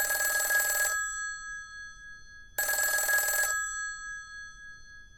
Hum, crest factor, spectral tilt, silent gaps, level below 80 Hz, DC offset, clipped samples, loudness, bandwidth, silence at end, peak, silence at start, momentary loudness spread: none; 18 dB; 2 dB/octave; none; -58 dBFS; under 0.1%; under 0.1%; -28 LUFS; 17.5 kHz; 0 s; -14 dBFS; 0 s; 22 LU